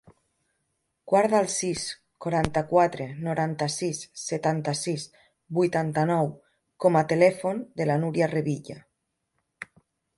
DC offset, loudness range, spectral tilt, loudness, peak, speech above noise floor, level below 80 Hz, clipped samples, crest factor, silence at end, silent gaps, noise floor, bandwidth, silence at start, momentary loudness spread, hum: under 0.1%; 3 LU; -5.5 dB/octave; -26 LUFS; -6 dBFS; 54 dB; -58 dBFS; under 0.1%; 20 dB; 0.55 s; none; -79 dBFS; 11.5 kHz; 1.05 s; 13 LU; none